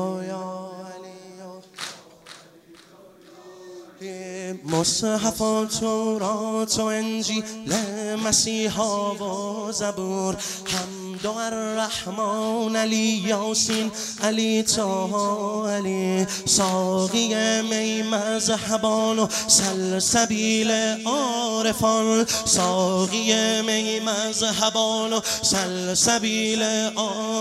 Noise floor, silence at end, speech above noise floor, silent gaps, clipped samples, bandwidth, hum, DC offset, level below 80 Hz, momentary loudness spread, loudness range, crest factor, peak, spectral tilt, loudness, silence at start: -50 dBFS; 0 s; 27 dB; none; under 0.1%; 15.5 kHz; none; under 0.1%; -58 dBFS; 13 LU; 7 LU; 20 dB; -4 dBFS; -3 dB/octave; -22 LUFS; 0 s